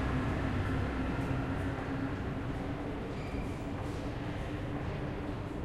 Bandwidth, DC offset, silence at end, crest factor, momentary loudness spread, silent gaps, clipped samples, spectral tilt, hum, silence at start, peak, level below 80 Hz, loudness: 13 kHz; under 0.1%; 0 s; 14 dB; 5 LU; none; under 0.1%; -7.5 dB/octave; none; 0 s; -22 dBFS; -44 dBFS; -37 LUFS